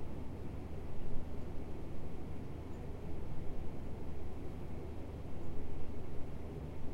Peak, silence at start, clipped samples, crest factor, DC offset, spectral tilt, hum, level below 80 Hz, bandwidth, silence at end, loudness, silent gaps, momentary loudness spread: -22 dBFS; 0 s; under 0.1%; 14 dB; under 0.1%; -8 dB/octave; none; -46 dBFS; 4.9 kHz; 0 s; -47 LUFS; none; 1 LU